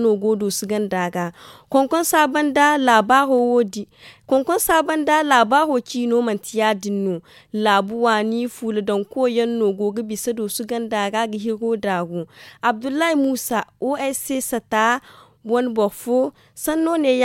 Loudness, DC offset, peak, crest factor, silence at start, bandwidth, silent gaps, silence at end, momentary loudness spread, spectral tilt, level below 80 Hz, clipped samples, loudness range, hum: -20 LUFS; under 0.1%; -2 dBFS; 18 dB; 0 s; 17 kHz; none; 0 s; 9 LU; -4 dB/octave; -58 dBFS; under 0.1%; 5 LU; none